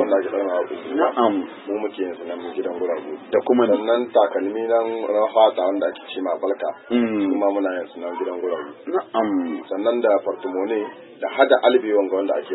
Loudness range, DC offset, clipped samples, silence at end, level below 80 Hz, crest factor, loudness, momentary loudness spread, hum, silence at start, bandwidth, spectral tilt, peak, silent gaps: 4 LU; under 0.1%; under 0.1%; 0 s; -76 dBFS; 20 dB; -21 LUFS; 11 LU; none; 0 s; 4.1 kHz; -9.5 dB/octave; -2 dBFS; none